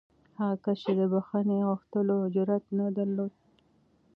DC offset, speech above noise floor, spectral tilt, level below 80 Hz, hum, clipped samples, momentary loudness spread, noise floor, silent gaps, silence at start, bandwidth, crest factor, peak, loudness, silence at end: under 0.1%; 38 dB; -10.5 dB/octave; -76 dBFS; none; under 0.1%; 5 LU; -66 dBFS; none; 0.4 s; 5.2 kHz; 14 dB; -16 dBFS; -29 LUFS; 0.85 s